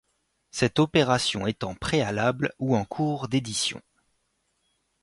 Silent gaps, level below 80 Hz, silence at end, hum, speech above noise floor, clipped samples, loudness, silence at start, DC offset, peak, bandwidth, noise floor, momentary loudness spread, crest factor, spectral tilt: none; -54 dBFS; 1.25 s; none; 48 dB; under 0.1%; -26 LUFS; 0.55 s; under 0.1%; -8 dBFS; 11.5 kHz; -73 dBFS; 8 LU; 20 dB; -4.5 dB/octave